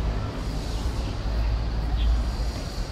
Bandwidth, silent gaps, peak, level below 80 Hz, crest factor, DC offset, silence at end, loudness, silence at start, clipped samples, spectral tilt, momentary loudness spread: 12 kHz; none; -14 dBFS; -26 dBFS; 12 dB; under 0.1%; 0 s; -29 LUFS; 0 s; under 0.1%; -6 dB/octave; 5 LU